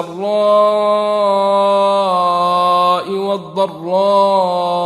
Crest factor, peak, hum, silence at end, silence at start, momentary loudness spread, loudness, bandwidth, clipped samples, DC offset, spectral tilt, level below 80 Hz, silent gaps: 12 dB; -2 dBFS; none; 0 s; 0 s; 7 LU; -14 LUFS; 12.5 kHz; under 0.1%; under 0.1%; -5.5 dB/octave; -68 dBFS; none